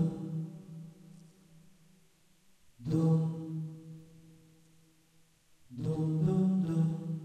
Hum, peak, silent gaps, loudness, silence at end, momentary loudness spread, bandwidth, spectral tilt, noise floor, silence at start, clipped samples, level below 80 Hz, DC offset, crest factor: none; -18 dBFS; none; -33 LUFS; 0 s; 21 LU; 8.8 kHz; -9.5 dB/octave; -66 dBFS; 0 s; under 0.1%; -66 dBFS; under 0.1%; 18 dB